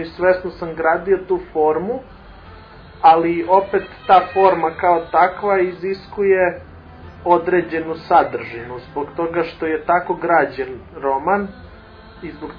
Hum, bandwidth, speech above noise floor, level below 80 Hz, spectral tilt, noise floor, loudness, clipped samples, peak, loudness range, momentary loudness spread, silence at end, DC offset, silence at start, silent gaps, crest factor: none; 5.2 kHz; 23 dB; -46 dBFS; -8.5 dB/octave; -41 dBFS; -18 LUFS; under 0.1%; 0 dBFS; 5 LU; 14 LU; 0 s; under 0.1%; 0 s; none; 18 dB